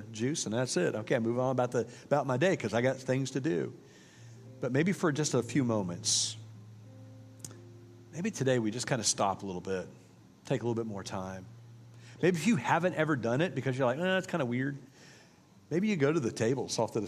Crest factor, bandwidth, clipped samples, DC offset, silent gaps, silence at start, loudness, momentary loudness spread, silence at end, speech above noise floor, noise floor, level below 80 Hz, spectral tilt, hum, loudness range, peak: 20 dB; 15 kHz; under 0.1%; under 0.1%; none; 0 s; -31 LUFS; 19 LU; 0 s; 28 dB; -59 dBFS; -74 dBFS; -4.5 dB/octave; none; 4 LU; -12 dBFS